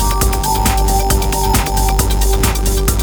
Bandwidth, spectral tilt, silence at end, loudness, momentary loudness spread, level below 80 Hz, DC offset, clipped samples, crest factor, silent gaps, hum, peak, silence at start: over 20 kHz; -4 dB/octave; 0 s; -15 LUFS; 1 LU; -16 dBFS; under 0.1%; under 0.1%; 12 dB; none; none; 0 dBFS; 0 s